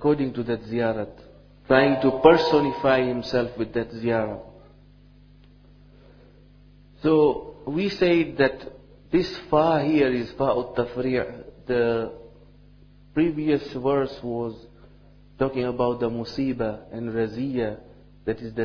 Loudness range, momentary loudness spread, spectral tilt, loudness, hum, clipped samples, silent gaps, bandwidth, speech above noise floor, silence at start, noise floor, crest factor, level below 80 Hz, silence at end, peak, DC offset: 7 LU; 12 LU; -7.5 dB/octave; -24 LUFS; 50 Hz at -55 dBFS; under 0.1%; none; 5.4 kHz; 29 dB; 0 s; -51 dBFS; 24 dB; -50 dBFS; 0 s; 0 dBFS; under 0.1%